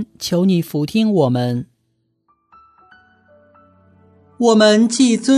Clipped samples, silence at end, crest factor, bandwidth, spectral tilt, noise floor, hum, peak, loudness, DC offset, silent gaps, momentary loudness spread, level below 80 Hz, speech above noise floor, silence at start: under 0.1%; 0 s; 18 dB; 14 kHz; -5.5 dB/octave; -67 dBFS; none; 0 dBFS; -15 LUFS; under 0.1%; none; 10 LU; -62 dBFS; 52 dB; 0 s